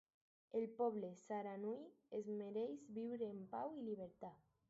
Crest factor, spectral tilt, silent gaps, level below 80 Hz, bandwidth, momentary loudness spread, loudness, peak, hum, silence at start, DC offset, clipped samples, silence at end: 18 dB; -7 dB/octave; none; -88 dBFS; 7.6 kHz; 8 LU; -48 LUFS; -30 dBFS; none; 0.55 s; under 0.1%; under 0.1%; 0.35 s